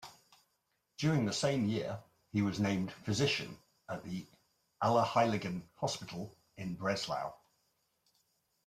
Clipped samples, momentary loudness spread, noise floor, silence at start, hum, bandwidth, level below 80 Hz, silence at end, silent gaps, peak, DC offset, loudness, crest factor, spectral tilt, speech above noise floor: under 0.1%; 15 LU; -81 dBFS; 0 s; none; 15 kHz; -70 dBFS; 1.3 s; none; -16 dBFS; under 0.1%; -35 LUFS; 20 dB; -5.5 dB/octave; 46 dB